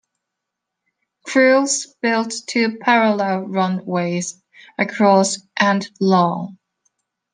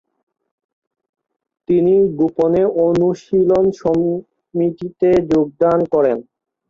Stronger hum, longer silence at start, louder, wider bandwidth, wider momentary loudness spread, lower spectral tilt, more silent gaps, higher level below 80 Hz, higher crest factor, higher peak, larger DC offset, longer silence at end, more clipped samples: neither; second, 1.25 s vs 1.7 s; about the same, -18 LUFS vs -16 LUFS; first, 10 kHz vs 7.2 kHz; first, 10 LU vs 7 LU; second, -4.5 dB/octave vs -9 dB/octave; neither; second, -70 dBFS vs -50 dBFS; about the same, 18 dB vs 14 dB; about the same, -2 dBFS vs -4 dBFS; neither; first, 0.8 s vs 0.45 s; neither